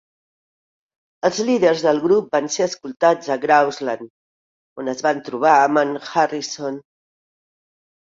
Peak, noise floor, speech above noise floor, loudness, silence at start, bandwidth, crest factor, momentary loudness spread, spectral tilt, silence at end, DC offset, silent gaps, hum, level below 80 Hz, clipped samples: -2 dBFS; under -90 dBFS; over 72 dB; -19 LUFS; 1.25 s; 7.8 kHz; 18 dB; 12 LU; -4 dB/octave; 1.4 s; under 0.1%; 4.10-4.76 s; none; -68 dBFS; under 0.1%